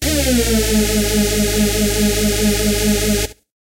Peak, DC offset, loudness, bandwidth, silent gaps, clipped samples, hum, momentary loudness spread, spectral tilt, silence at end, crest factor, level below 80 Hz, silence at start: -4 dBFS; under 0.1%; -16 LUFS; 16 kHz; none; under 0.1%; none; 1 LU; -3.5 dB/octave; 0.3 s; 12 dB; -24 dBFS; 0 s